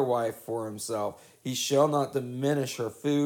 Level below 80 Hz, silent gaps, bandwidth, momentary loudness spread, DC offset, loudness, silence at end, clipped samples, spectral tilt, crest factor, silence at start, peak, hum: -76 dBFS; none; 19 kHz; 10 LU; under 0.1%; -29 LUFS; 0 s; under 0.1%; -5 dB/octave; 18 dB; 0 s; -12 dBFS; none